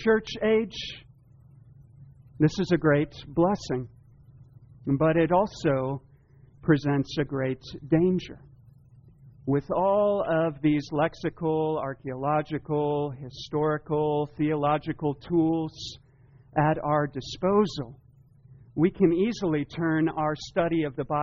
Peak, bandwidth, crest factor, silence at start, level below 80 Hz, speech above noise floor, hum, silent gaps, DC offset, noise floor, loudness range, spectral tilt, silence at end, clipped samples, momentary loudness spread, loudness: -8 dBFS; 7.2 kHz; 18 dB; 0 s; -54 dBFS; 30 dB; none; none; under 0.1%; -55 dBFS; 2 LU; -6 dB/octave; 0 s; under 0.1%; 11 LU; -26 LUFS